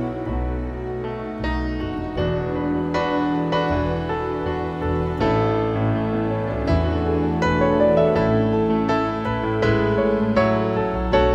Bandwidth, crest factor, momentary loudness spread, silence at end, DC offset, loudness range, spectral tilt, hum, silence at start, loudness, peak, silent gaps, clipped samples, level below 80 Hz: 8 kHz; 16 dB; 8 LU; 0 s; under 0.1%; 4 LU; -8 dB/octave; none; 0 s; -21 LUFS; -6 dBFS; none; under 0.1%; -32 dBFS